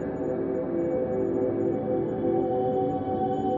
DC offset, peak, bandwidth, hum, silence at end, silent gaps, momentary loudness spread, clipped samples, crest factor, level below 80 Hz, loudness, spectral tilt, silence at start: under 0.1%; -14 dBFS; 7.2 kHz; none; 0 s; none; 3 LU; under 0.1%; 12 dB; -54 dBFS; -27 LUFS; -10 dB/octave; 0 s